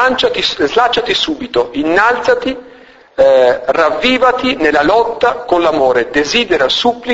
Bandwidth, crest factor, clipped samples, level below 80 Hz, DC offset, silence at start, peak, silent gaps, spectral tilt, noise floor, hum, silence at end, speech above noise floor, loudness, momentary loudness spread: 8 kHz; 12 dB; under 0.1%; -42 dBFS; under 0.1%; 0 s; 0 dBFS; none; -3.5 dB/octave; -40 dBFS; none; 0 s; 28 dB; -12 LUFS; 5 LU